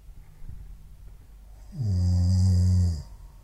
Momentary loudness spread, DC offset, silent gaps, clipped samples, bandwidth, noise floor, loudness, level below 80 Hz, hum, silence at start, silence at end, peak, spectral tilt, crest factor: 24 LU; under 0.1%; none; under 0.1%; 8.8 kHz; -47 dBFS; -25 LUFS; -40 dBFS; none; 0.1 s; 0.05 s; -14 dBFS; -7.5 dB/octave; 12 dB